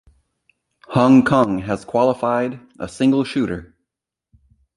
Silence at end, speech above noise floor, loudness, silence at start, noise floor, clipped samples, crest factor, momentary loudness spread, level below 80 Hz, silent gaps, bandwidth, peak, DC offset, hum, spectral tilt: 1.1 s; 65 dB; -18 LUFS; 0.9 s; -83 dBFS; under 0.1%; 18 dB; 14 LU; -50 dBFS; none; 11 kHz; -2 dBFS; under 0.1%; none; -7 dB/octave